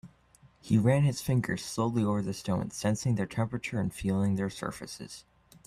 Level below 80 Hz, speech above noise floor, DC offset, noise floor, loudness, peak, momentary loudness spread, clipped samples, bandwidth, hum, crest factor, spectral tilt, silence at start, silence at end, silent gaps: -56 dBFS; 32 dB; under 0.1%; -61 dBFS; -30 LUFS; -12 dBFS; 13 LU; under 0.1%; 14.5 kHz; none; 18 dB; -6.5 dB/octave; 0.05 s; 0.45 s; none